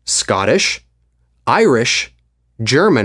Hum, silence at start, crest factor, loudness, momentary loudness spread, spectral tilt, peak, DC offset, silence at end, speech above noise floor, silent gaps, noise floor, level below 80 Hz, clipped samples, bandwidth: none; 0.05 s; 16 dB; -15 LUFS; 12 LU; -3.5 dB/octave; 0 dBFS; under 0.1%; 0 s; 45 dB; none; -59 dBFS; -50 dBFS; under 0.1%; 11.5 kHz